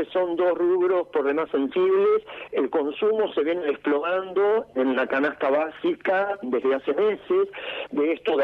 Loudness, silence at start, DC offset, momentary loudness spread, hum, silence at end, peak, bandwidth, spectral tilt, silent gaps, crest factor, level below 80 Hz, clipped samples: -24 LUFS; 0 s; under 0.1%; 5 LU; none; 0 s; -12 dBFS; 4.7 kHz; -7 dB/octave; none; 12 dB; -68 dBFS; under 0.1%